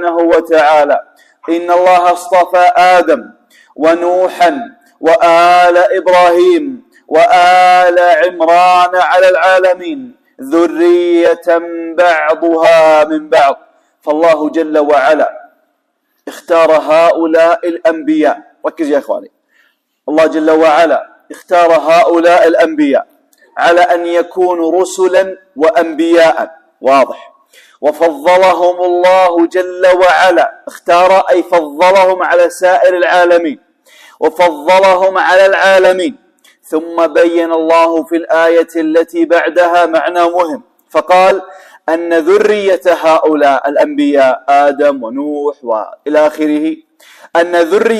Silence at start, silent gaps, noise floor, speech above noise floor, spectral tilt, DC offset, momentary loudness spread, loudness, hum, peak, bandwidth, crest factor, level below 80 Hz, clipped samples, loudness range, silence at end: 0 s; none; -63 dBFS; 54 dB; -4 dB/octave; under 0.1%; 10 LU; -9 LUFS; none; 0 dBFS; 14 kHz; 10 dB; -56 dBFS; under 0.1%; 4 LU; 0 s